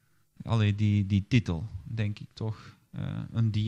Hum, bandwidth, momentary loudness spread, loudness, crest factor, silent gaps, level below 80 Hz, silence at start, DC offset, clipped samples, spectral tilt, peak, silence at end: none; 7.6 kHz; 13 LU; -30 LUFS; 20 dB; none; -54 dBFS; 0.4 s; under 0.1%; under 0.1%; -7.5 dB/octave; -10 dBFS; 0 s